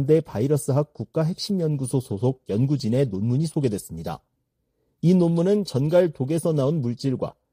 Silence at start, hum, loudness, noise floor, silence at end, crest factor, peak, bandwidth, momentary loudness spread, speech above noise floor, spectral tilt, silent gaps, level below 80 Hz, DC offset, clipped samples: 0 s; none; -23 LUFS; -74 dBFS; 0.2 s; 16 dB; -8 dBFS; 15.5 kHz; 8 LU; 52 dB; -7.5 dB/octave; none; -56 dBFS; under 0.1%; under 0.1%